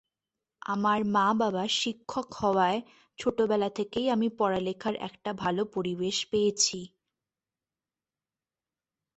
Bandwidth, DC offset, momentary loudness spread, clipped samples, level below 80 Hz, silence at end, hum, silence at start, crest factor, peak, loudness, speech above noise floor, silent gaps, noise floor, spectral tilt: 8.4 kHz; under 0.1%; 10 LU; under 0.1%; -66 dBFS; 2.3 s; none; 0.7 s; 18 dB; -12 dBFS; -28 LUFS; over 62 dB; none; under -90 dBFS; -3.5 dB/octave